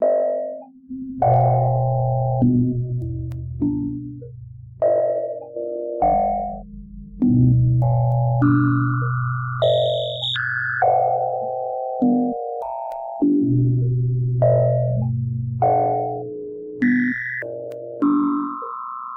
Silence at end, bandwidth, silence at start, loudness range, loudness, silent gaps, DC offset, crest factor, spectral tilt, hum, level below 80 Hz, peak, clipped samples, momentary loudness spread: 0 s; 4.1 kHz; 0 s; 4 LU; -21 LUFS; none; under 0.1%; 14 dB; -9.5 dB/octave; none; -42 dBFS; -6 dBFS; under 0.1%; 14 LU